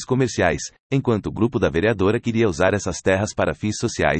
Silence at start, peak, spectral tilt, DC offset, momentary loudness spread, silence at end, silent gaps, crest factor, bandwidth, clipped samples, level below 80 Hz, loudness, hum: 0 s; -4 dBFS; -5.5 dB/octave; under 0.1%; 5 LU; 0 s; 0.80-0.90 s; 16 dB; 8.8 kHz; under 0.1%; -44 dBFS; -21 LUFS; none